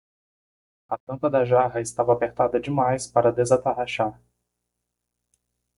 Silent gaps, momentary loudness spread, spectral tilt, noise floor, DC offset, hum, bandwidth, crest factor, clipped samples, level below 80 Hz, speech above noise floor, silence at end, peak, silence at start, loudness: 1.00-1.07 s; 8 LU; -5.5 dB/octave; -81 dBFS; under 0.1%; 60 Hz at -45 dBFS; 11.5 kHz; 20 dB; under 0.1%; -58 dBFS; 59 dB; 1.65 s; -4 dBFS; 0.9 s; -23 LUFS